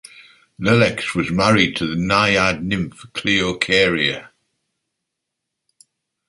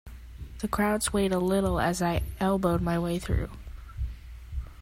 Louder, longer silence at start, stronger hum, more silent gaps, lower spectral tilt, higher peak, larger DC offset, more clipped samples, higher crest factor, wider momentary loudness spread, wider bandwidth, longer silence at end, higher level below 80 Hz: first, -17 LUFS vs -28 LUFS; first, 0.2 s vs 0.05 s; neither; neither; about the same, -4.5 dB/octave vs -5.5 dB/octave; first, -2 dBFS vs -12 dBFS; neither; neither; about the same, 18 dB vs 16 dB; second, 9 LU vs 19 LU; second, 11.5 kHz vs 16 kHz; first, 2 s vs 0 s; second, -46 dBFS vs -38 dBFS